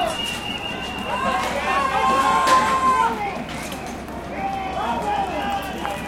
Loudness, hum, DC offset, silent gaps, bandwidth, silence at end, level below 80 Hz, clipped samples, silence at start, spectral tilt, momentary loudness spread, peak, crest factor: -22 LUFS; none; under 0.1%; none; 17 kHz; 0 s; -42 dBFS; under 0.1%; 0 s; -3.5 dB/octave; 13 LU; -4 dBFS; 18 dB